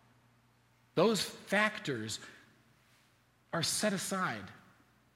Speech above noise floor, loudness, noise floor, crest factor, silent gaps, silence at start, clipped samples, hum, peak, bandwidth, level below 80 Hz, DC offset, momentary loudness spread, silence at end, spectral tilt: 35 dB; -34 LUFS; -69 dBFS; 22 dB; none; 0.95 s; under 0.1%; none; -16 dBFS; 16 kHz; -76 dBFS; under 0.1%; 13 LU; 0.6 s; -3.5 dB/octave